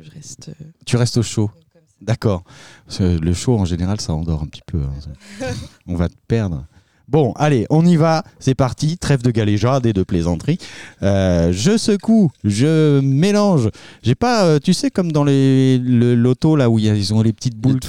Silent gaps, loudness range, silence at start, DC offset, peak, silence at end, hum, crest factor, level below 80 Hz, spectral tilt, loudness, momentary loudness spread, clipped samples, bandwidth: none; 7 LU; 0 s; 0.5%; -4 dBFS; 0 s; none; 12 dB; -38 dBFS; -6.5 dB/octave; -17 LUFS; 13 LU; under 0.1%; 13 kHz